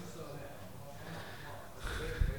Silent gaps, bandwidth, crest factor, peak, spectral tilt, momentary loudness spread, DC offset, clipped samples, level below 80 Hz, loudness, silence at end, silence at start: none; over 20 kHz; 24 dB; -18 dBFS; -5 dB/octave; 9 LU; 0.3%; under 0.1%; -42 dBFS; -45 LUFS; 0 s; 0 s